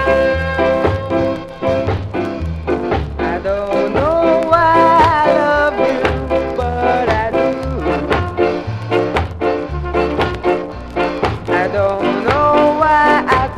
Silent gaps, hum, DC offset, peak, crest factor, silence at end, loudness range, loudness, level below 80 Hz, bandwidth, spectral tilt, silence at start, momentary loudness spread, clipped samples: none; none; under 0.1%; 0 dBFS; 14 dB; 0 s; 5 LU; -15 LUFS; -30 dBFS; 12.5 kHz; -7 dB/octave; 0 s; 9 LU; under 0.1%